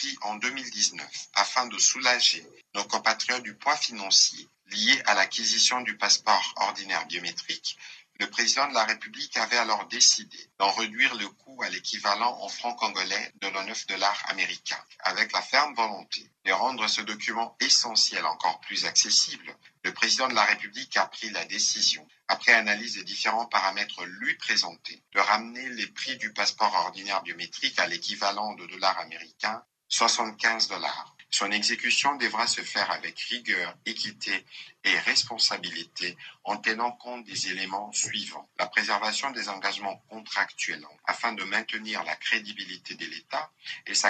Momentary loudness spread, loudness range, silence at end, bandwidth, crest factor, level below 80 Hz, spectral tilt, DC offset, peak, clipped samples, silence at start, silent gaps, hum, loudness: 13 LU; 6 LU; 0 s; 9.4 kHz; 24 dB; -88 dBFS; 0.5 dB/octave; under 0.1%; -4 dBFS; under 0.1%; 0 s; none; none; -26 LUFS